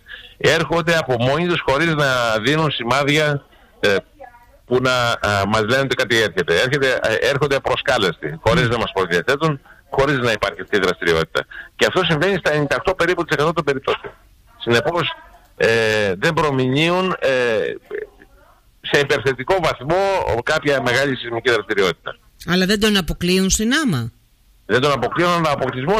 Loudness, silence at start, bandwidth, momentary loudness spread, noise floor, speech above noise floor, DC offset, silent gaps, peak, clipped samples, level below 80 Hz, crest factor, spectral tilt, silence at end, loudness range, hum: -18 LUFS; 0.1 s; 15.5 kHz; 6 LU; -54 dBFS; 36 dB; under 0.1%; none; -4 dBFS; under 0.1%; -42 dBFS; 14 dB; -4.5 dB/octave; 0 s; 2 LU; none